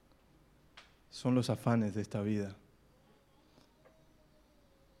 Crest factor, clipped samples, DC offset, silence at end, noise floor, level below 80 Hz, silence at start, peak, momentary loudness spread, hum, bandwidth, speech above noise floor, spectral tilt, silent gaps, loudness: 22 dB; under 0.1%; under 0.1%; 2.45 s; -66 dBFS; -68 dBFS; 0.75 s; -16 dBFS; 27 LU; none; 14.5 kHz; 33 dB; -7 dB/octave; none; -35 LUFS